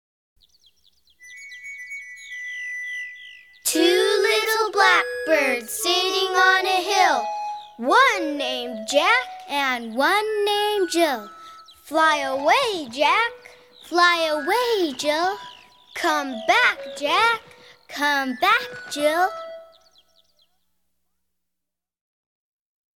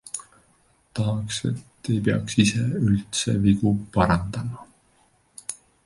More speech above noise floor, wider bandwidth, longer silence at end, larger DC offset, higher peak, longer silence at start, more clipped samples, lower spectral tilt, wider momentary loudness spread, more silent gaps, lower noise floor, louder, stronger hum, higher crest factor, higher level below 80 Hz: first, 64 dB vs 40 dB; first, 18.5 kHz vs 11.5 kHz; first, 3.3 s vs 0.3 s; neither; about the same, -4 dBFS vs -4 dBFS; first, 1.25 s vs 0.05 s; neither; second, -1 dB/octave vs -5.5 dB/octave; about the same, 16 LU vs 15 LU; neither; first, -85 dBFS vs -62 dBFS; first, -20 LUFS vs -23 LUFS; neither; about the same, 18 dB vs 20 dB; second, -66 dBFS vs -44 dBFS